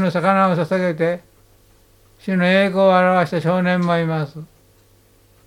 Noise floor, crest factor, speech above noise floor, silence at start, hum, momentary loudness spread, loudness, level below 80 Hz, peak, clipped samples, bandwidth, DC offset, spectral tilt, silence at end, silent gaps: -53 dBFS; 16 dB; 36 dB; 0 s; none; 13 LU; -17 LUFS; -58 dBFS; -2 dBFS; under 0.1%; 11.5 kHz; under 0.1%; -7.5 dB/octave; 1 s; none